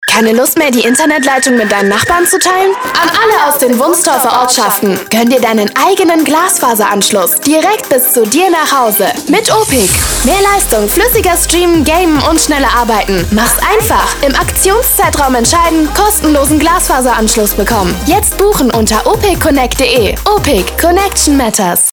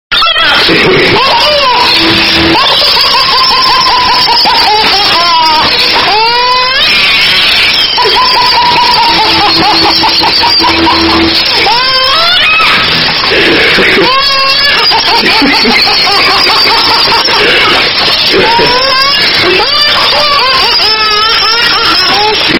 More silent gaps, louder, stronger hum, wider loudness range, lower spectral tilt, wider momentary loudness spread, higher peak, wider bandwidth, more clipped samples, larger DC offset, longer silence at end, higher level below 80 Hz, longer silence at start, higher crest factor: neither; second, -8 LUFS vs -4 LUFS; neither; about the same, 1 LU vs 0 LU; about the same, -3 dB/octave vs -3 dB/octave; about the same, 2 LU vs 1 LU; about the same, 0 dBFS vs 0 dBFS; about the same, over 20 kHz vs over 20 kHz; second, under 0.1% vs 3%; neither; about the same, 0 s vs 0 s; first, -24 dBFS vs -32 dBFS; about the same, 0 s vs 0.1 s; about the same, 8 dB vs 6 dB